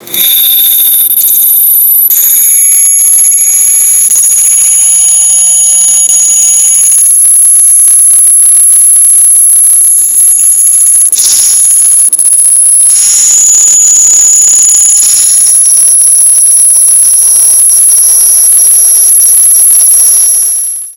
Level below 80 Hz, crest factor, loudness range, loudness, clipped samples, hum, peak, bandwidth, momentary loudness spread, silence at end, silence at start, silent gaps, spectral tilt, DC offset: -54 dBFS; 4 dB; 2 LU; -1 LUFS; 10%; none; 0 dBFS; over 20 kHz; 2 LU; 0.05 s; 0.05 s; none; 3.5 dB/octave; under 0.1%